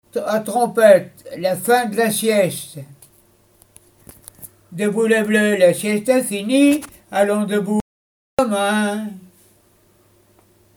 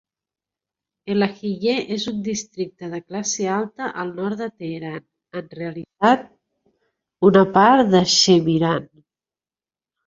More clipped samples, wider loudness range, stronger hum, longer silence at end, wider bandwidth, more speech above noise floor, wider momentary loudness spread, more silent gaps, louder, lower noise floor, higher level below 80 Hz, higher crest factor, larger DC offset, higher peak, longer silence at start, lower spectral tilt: neither; second, 6 LU vs 10 LU; neither; first, 1.6 s vs 1.2 s; first, over 20 kHz vs 7.8 kHz; second, 39 dB vs over 71 dB; second, 15 LU vs 18 LU; first, 7.81-8.37 s vs none; about the same, -17 LUFS vs -19 LUFS; second, -56 dBFS vs under -90 dBFS; about the same, -58 dBFS vs -60 dBFS; about the same, 20 dB vs 20 dB; neither; about the same, 0 dBFS vs -2 dBFS; second, 0.15 s vs 1.05 s; about the same, -4.5 dB/octave vs -4.5 dB/octave